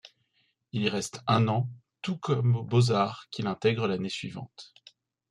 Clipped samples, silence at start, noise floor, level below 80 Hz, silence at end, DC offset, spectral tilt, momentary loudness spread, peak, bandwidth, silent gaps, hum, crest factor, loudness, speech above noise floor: under 0.1%; 0.05 s; -73 dBFS; -66 dBFS; 0.65 s; under 0.1%; -6 dB/octave; 13 LU; -10 dBFS; 11.5 kHz; none; none; 18 dB; -28 LUFS; 45 dB